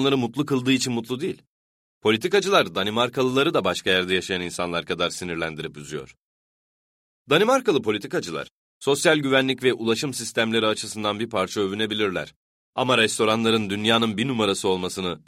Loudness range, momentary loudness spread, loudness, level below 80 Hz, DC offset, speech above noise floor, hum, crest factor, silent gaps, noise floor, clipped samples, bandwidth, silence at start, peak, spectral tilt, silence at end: 4 LU; 10 LU; -23 LUFS; -60 dBFS; under 0.1%; over 67 dB; none; 20 dB; 1.47-2.01 s, 6.20-7.26 s, 8.51-8.81 s, 12.36-12.73 s; under -90 dBFS; under 0.1%; 16 kHz; 0 s; -4 dBFS; -4 dB/octave; 0.1 s